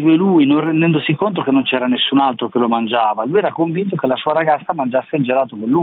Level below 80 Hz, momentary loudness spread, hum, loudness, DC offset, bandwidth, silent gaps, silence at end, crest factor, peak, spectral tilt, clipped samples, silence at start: -62 dBFS; 6 LU; none; -16 LUFS; under 0.1%; 4.1 kHz; none; 0 s; 12 dB; -4 dBFS; -10 dB/octave; under 0.1%; 0 s